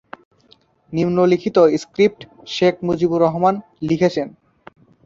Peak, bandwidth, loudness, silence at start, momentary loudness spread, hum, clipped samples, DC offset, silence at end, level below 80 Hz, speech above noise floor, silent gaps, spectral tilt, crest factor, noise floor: -2 dBFS; 7.8 kHz; -18 LUFS; 0.9 s; 12 LU; none; under 0.1%; under 0.1%; 0.75 s; -56 dBFS; 38 dB; none; -7 dB/octave; 16 dB; -55 dBFS